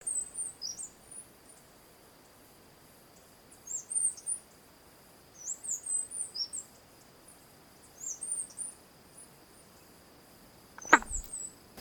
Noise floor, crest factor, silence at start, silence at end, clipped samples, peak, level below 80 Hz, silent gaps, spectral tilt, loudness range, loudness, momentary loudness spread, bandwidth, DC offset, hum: -58 dBFS; 36 dB; 0 s; 0 s; under 0.1%; -2 dBFS; -58 dBFS; none; 0 dB/octave; 8 LU; -33 LUFS; 26 LU; 19 kHz; under 0.1%; none